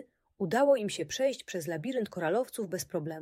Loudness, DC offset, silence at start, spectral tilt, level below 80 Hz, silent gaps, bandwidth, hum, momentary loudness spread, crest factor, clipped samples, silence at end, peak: -31 LUFS; under 0.1%; 0 s; -4.5 dB/octave; -72 dBFS; none; 16 kHz; none; 10 LU; 18 dB; under 0.1%; 0 s; -14 dBFS